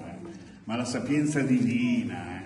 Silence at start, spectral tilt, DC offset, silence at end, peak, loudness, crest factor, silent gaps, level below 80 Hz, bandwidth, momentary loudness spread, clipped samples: 0 s; -6 dB/octave; under 0.1%; 0 s; -14 dBFS; -27 LUFS; 14 dB; none; -62 dBFS; 11.5 kHz; 18 LU; under 0.1%